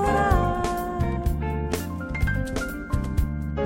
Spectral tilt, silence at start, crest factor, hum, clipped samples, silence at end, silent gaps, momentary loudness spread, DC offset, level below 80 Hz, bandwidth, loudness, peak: -6.5 dB/octave; 0 s; 18 dB; none; under 0.1%; 0 s; none; 8 LU; under 0.1%; -30 dBFS; 16.5 kHz; -26 LUFS; -6 dBFS